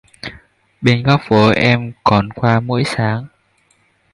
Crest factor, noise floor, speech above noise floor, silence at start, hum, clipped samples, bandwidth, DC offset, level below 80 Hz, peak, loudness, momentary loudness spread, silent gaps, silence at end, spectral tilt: 16 dB; -58 dBFS; 44 dB; 0.25 s; none; under 0.1%; 11.5 kHz; under 0.1%; -44 dBFS; 0 dBFS; -15 LUFS; 14 LU; none; 0.85 s; -7 dB/octave